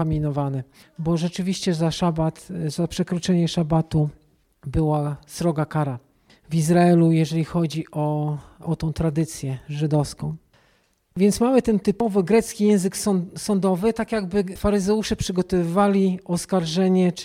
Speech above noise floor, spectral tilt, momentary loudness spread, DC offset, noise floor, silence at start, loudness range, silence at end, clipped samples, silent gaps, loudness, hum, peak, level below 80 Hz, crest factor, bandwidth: 42 dB; -6.5 dB/octave; 10 LU; under 0.1%; -63 dBFS; 0 s; 4 LU; 0 s; under 0.1%; none; -22 LUFS; none; -6 dBFS; -44 dBFS; 16 dB; 15.5 kHz